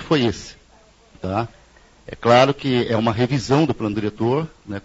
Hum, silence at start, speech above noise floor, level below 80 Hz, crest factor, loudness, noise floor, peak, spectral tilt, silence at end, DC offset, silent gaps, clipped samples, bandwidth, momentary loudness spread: none; 0 s; 33 dB; -48 dBFS; 20 dB; -20 LUFS; -52 dBFS; 0 dBFS; -6.5 dB/octave; 0.05 s; under 0.1%; none; under 0.1%; 8 kHz; 18 LU